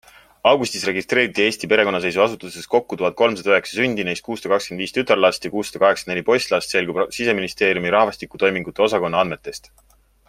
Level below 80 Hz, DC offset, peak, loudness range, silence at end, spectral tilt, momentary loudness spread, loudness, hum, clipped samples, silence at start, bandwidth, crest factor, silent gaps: -56 dBFS; under 0.1%; 0 dBFS; 1 LU; 0.7 s; -4 dB/octave; 7 LU; -19 LUFS; none; under 0.1%; 0.45 s; 16 kHz; 20 dB; none